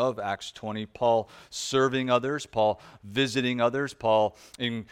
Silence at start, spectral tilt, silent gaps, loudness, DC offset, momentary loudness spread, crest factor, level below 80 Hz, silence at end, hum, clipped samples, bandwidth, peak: 0 s; -4.5 dB/octave; none; -27 LUFS; under 0.1%; 10 LU; 20 dB; -62 dBFS; 0.05 s; none; under 0.1%; 15.5 kHz; -8 dBFS